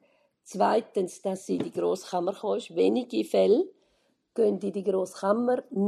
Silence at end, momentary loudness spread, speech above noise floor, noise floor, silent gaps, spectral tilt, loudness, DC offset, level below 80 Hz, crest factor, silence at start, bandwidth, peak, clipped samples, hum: 0 s; 8 LU; 44 dB; -71 dBFS; none; -6 dB/octave; -27 LUFS; under 0.1%; -80 dBFS; 18 dB; 0.5 s; 13 kHz; -10 dBFS; under 0.1%; none